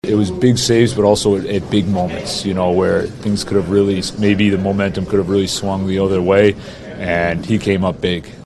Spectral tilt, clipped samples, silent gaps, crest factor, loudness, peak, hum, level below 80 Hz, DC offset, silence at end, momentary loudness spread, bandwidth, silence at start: -5.5 dB/octave; under 0.1%; none; 16 dB; -16 LUFS; 0 dBFS; none; -40 dBFS; under 0.1%; 0.05 s; 7 LU; 12.5 kHz; 0.05 s